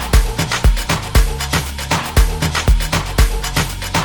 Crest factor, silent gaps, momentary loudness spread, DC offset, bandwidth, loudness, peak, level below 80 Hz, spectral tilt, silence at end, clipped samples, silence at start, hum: 14 dB; none; 3 LU; under 0.1%; 19.5 kHz; -17 LUFS; 0 dBFS; -16 dBFS; -4 dB/octave; 0 s; under 0.1%; 0 s; none